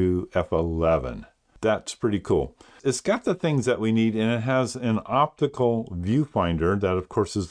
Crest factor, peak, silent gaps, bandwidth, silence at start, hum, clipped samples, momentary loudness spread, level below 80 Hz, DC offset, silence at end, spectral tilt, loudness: 16 dB; -8 dBFS; none; 10.5 kHz; 0 s; none; under 0.1%; 4 LU; -44 dBFS; under 0.1%; 0 s; -6.5 dB/octave; -25 LUFS